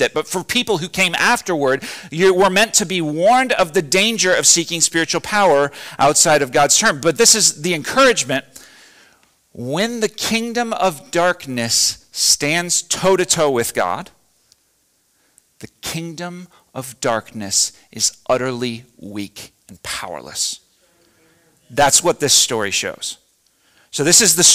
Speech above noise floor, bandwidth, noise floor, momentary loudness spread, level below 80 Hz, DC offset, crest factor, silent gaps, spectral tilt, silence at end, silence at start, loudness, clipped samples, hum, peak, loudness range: 45 dB; 16 kHz; -62 dBFS; 15 LU; -52 dBFS; under 0.1%; 18 dB; none; -2 dB/octave; 0 s; 0 s; -15 LUFS; under 0.1%; none; 0 dBFS; 10 LU